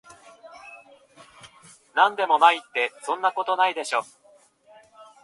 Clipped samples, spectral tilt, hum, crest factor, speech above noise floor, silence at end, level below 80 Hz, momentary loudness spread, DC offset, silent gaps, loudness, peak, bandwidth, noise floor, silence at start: under 0.1%; -1 dB/octave; none; 24 dB; 35 dB; 0.2 s; -78 dBFS; 25 LU; under 0.1%; none; -22 LUFS; -2 dBFS; 11.5 kHz; -57 dBFS; 0.45 s